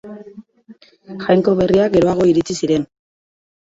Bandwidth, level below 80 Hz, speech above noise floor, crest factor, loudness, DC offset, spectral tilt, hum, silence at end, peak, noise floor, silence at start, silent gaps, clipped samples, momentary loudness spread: 8 kHz; -48 dBFS; 30 dB; 16 dB; -16 LUFS; under 0.1%; -6.5 dB/octave; none; 0.75 s; -2 dBFS; -46 dBFS; 0.05 s; none; under 0.1%; 21 LU